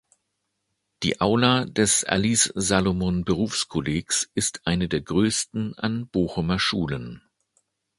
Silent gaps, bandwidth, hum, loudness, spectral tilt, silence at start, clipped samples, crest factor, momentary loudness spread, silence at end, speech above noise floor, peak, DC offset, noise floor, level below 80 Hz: none; 11.5 kHz; none; -23 LUFS; -3.5 dB/octave; 1 s; under 0.1%; 22 dB; 8 LU; 0.8 s; 54 dB; -2 dBFS; under 0.1%; -77 dBFS; -46 dBFS